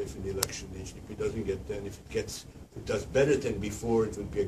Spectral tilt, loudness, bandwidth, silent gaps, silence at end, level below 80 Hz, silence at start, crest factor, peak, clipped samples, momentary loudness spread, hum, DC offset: -5 dB/octave; -32 LUFS; 15.5 kHz; none; 0 s; -48 dBFS; 0 s; 26 dB; -6 dBFS; under 0.1%; 15 LU; none; under 0.1%